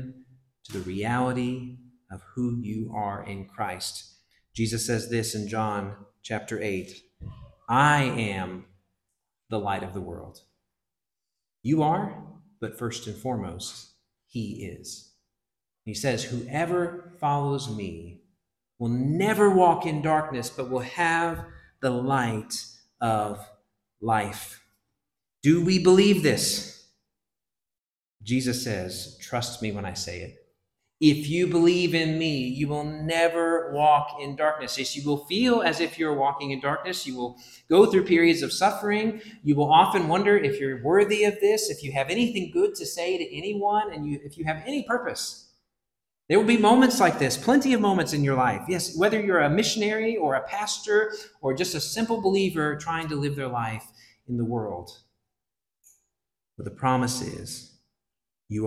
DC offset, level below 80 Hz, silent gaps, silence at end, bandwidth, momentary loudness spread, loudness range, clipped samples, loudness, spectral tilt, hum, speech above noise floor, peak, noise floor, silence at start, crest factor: under 0.1%; -58 dBFS; none; 0 s; 15.5 kHz; 17 LU; 10 LU; under 0.1%; -25 LUFS; -5 dB/octave; none; over 65 dB; -4 dBFS; under -90 dBFS; 0 s; 22 dB